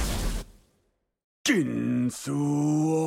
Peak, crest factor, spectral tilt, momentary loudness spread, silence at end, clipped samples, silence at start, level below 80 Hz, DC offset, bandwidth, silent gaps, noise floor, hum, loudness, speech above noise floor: -10 dBFS; 18 dB; -5 dB/octave; 8 LU; 0 s; under 0.1%; 0 s; -38 dBFS; under 0.1%; 17 kHz; 1.24-1.45 s; -72 dBFS; none; -27 LUFS; 47 dB